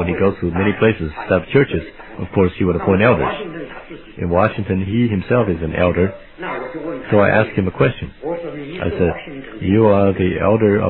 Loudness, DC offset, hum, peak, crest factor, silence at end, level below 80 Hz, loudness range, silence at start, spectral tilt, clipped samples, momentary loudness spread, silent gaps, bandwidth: -17 LUFS; under 0.1%; none; 0 dBFS; 18 dB; 0 s; -38 dBFS; 2 LU; 0 s; -11.5 dB/octave; under 0.1%; 14 LU; none; 4.2 kHz